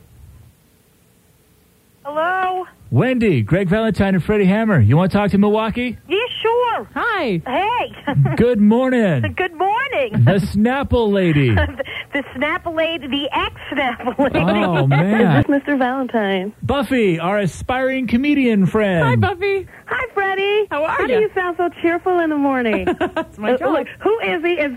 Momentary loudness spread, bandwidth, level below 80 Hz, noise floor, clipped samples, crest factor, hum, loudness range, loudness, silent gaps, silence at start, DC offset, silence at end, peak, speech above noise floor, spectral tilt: 7 LU; 15 kHz; -40 dBFS; -54 dBFS; under 0.1%; 14 dB; none; 3 LU; -17 LUFS; none; 0.25 s; under 0.1%; 0 s; -2 dBFS; 37 dB; -7.5 dB/octave